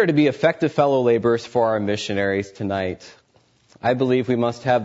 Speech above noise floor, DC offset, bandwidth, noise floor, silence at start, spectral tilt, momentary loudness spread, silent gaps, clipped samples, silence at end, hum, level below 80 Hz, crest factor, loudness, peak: 40 dB; under 0.1%; 8 kHz; -59 dBFS; 0 s; -6.5 dB/octave; 8 LU; none; under 0.1%; 0 s; none; -60 dBFS; 16 dB; -21 LUFS; -4 dBFS